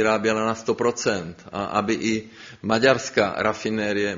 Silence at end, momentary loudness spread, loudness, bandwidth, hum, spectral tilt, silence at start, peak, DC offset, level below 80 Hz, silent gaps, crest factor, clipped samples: 0 s; 11 LU; -23 LUFS; 7.6 kHz; none; -3.5 dB/octave; 0 s; -4 dBFS; under 0.1%; -58 dBFS; none; 20 dB; under 0.1%